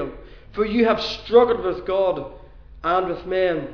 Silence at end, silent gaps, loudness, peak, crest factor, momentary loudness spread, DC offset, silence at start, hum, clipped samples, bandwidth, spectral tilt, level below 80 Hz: 0 s; none; -21 LUFS; -2 dBFS; 18 dB; 13 LU; 0.3%; 0 s; none; under 0.1%; 5.4 kHz; -6 dB/octave; -44 dBFS